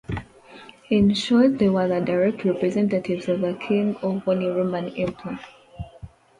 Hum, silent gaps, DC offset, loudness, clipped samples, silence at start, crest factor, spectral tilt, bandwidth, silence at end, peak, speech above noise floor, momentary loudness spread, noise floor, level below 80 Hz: none; none; under 0.1%; -22 LUFS; under 0.1%; 0.1 s; 16 dB; -7 dB/octave; 11 kHz; 0.3 s; -8 dBFS; 24 dB; 16 LU; -46 dBFS; -50 dBFS